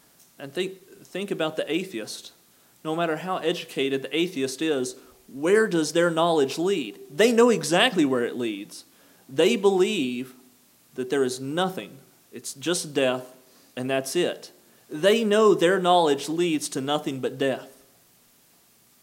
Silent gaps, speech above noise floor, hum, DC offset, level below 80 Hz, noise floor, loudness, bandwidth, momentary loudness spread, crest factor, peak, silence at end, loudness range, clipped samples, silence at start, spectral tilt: none; 35 dB; none; under 0.1%; -80 dBFS; -59 dBFS; -24 LUFS; 16.5 kHz; 17 LU; 22 dB; -4 dBFS; 1.35 s; 7 LU; under 0.1%; 0.4 s; -4 dB/octave